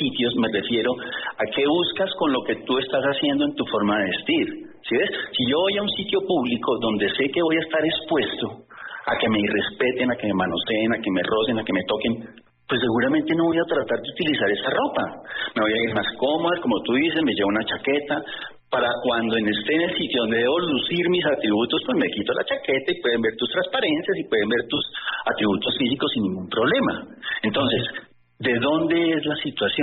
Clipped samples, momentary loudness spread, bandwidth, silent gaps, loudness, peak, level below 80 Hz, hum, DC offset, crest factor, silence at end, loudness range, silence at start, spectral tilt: under 0.1%; 6 LU; 4.3 kHz; none; -22 LUFS; -10 dBFS; -58 dBFS; none; under 0.1%; 12 dB; 0 s; 1 LU; 0 s; -2.5 dB/octave